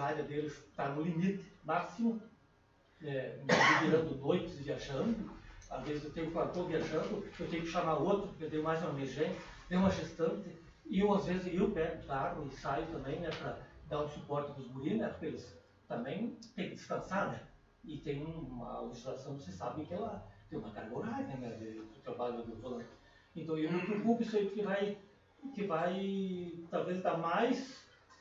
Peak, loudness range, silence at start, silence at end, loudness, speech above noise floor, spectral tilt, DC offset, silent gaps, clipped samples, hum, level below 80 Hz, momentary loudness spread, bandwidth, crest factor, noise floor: -14 dBFS; 9 LU; 0 s; 0.05 s; -37 LUFS; 31 dB; -6 dB/octave; under 0.1%; none; under 0.1%; none; -60 dBFS; 14 LU; 7.6 kHz; 22 dB; -68 dBFS